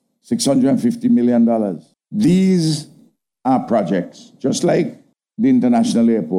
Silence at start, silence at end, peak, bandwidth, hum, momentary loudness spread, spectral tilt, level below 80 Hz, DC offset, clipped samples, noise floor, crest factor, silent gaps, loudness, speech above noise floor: 0.3 s; 0 s; -6 dBFS; 13 kHz; none; 11 LU; -6.5 dB/octave; -60 dBFS; under 0.1%; under 0.1%; -53 dBFS; 12 dB; none; -17 LUFS; 38 dB